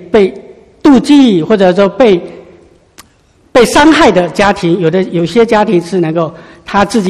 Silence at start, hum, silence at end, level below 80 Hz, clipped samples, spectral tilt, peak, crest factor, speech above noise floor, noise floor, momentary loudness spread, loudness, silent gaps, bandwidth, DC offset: 0 s; none; 0 s; -38 dBFS; 1%; -5.5 dB/octave; 0 dBFS; 10 dB; 40 dB; -48 dBFS; 8 LU; -9 LUFS; none; 14 kHz; under 0.1%